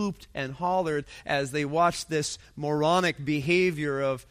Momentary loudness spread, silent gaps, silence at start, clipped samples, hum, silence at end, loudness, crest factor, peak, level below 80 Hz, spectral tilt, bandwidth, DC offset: 9 LU; none; 0 s; under 0.1%; none; 0.1 s; -27 LUFS; 16 dB; -10 dBFS; -56 dBFS; -5 dB/octave; 15.5 kHz; under 0.1%